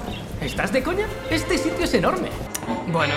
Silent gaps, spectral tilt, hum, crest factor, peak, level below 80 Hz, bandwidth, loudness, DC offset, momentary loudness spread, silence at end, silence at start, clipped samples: none; -4.5 dB/octave; none; 20 dB; -4 dBFS; -38 dBFS; 16.5 kHz; -24 LUFS; under 0.1%; 8 LU; 0 s; 0 s; under 0.1%